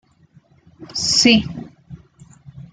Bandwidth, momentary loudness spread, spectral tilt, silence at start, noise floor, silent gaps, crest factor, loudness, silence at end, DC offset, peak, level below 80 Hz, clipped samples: 9.6 kHz; 23 LU; -2.5 dB/octave; 0.8 s; -53 dBFS; none; 20 dB; -15 LUFS; 0.1 s; under 0.1%; -2 dBFS; -50 dBFS; under 0.1%